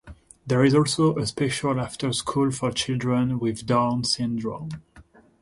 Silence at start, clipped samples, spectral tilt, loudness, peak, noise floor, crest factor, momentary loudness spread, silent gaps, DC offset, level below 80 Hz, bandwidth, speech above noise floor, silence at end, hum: 0.05 s; under 0.1%; -5.5 dB/octave; -24 LUFS; -8 dBFS; -52 dBFS; 16 dB; 11 LU; none; under 0.1%; -52 dBFS; 11.5 kHz; 29 dB; 0.4 s; none